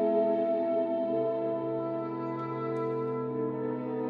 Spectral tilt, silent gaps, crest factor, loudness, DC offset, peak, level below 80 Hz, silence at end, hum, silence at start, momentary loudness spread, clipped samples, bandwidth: -10 dB/octave; none; 14 dB; -31 LUFS; under 0.1%; -16 dBFS; -82 dBFS; 0 s; none; 0 s; 7 LU; under 0.1%; 4.9 kHz